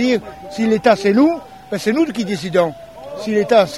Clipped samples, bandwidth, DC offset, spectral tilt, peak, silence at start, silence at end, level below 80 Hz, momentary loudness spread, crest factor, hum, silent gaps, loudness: under 0.1%; 15 kHz; 0.2%; -5.5 dB/octave; -2 dBFS; 0 s; 0 s; -52 dBFS; 14 LU; 16 dB; none; none; -17 LUFS